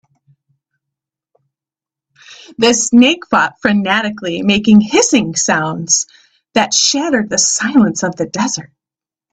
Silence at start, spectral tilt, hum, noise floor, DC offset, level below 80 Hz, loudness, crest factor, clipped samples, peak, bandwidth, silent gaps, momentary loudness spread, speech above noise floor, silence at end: 2.3 s; -3 dB/octave; none; -89 dBFS; under 0.1%; -52 dBFS; -13 LUFS; 16 dB; under 0.1%; 0 dBFS; 9.2 kHz; none; 9 LU; 76 dB; 0.65 s